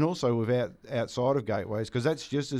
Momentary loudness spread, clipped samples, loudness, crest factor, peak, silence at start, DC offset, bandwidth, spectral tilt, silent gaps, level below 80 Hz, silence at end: 5 LU; under 0.1%; -29 LUFS; 16 dB; -12 dBFS; 0 s; under 0.1%; 13 kHz; -6.5 dB/octave; none; -62 dBFS; 0 s